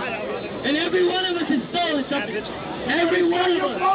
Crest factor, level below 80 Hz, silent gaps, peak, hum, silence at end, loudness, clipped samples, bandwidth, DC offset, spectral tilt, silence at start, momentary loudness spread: 12 dB; -54 dBFS; none; -10 dBFS; none; 0 s; -22 LUFS; under 0.1%; 4 kHz; under 0.1%; -8.5 dB/octave; 0 s; 9 LU